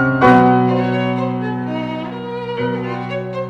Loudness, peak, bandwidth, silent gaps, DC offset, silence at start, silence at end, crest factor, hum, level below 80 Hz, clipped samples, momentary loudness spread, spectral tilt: -17 LUFS; -2 dBFS; 6.6 kHz; none; under 0.1%; 0 s; 0 s; 14 dB; none; -48 dBFS; under 0.1%; 14 LU; -8.5 dB/octave